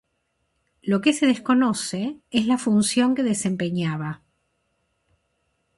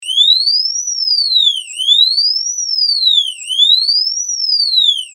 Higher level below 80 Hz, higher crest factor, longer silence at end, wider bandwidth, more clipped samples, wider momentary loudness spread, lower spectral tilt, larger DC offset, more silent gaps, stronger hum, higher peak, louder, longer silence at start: first, -62 dBFS vs under -90 dBFS; about the same, 18 dB vs 14 dB; first, 1.6 s vs 0.05 s; second, 11.5 kHz vs 16 kHz; neither; first, 11 LU vs 7 LU; first, -4.5 dB/octave vs 11.5 dB/octave; neither; neither; neither; second, -6 dBFS vs 0 dBFS; second, -22 LUFS vs -10 LUFS; first, 0.85 s vs 0 s